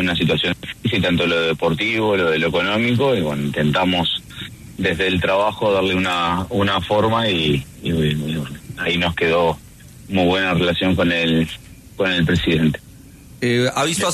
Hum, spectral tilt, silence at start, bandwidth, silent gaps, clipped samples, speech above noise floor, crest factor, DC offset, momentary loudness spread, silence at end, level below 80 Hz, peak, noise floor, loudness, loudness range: none; -5 dB/octave; 0 s; 13.5 kHz; none; under 0.1%; 23 dB; 14 dB; under 0.1%; 7 LU; 0 s; -44 dBFS; -4 dBFS; -42 dBFS; -18 LUFS; 2 LU